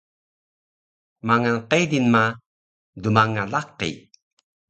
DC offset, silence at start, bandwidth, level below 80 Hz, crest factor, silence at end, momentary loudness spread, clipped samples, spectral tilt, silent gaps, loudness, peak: under 0.1%; 1.25 s; 8.8 kHz; -58 dBFS; 22 dB; 0.7 s; 12 LU; under 0.1%; -5.5 dB/octave; 2.46-2.93 s; -21 LUFS; -2 dBFS